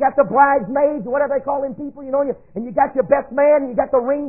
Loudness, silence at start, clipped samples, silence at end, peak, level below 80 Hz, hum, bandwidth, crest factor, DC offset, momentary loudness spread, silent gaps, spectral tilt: -18 LUFS; 0 s; under 0.1%; 0 s; 0 dBFS; -52 dBFS; none; 2.8 kHz; 16 dB; 0.4%; 10 LU; none; -14 dB/octave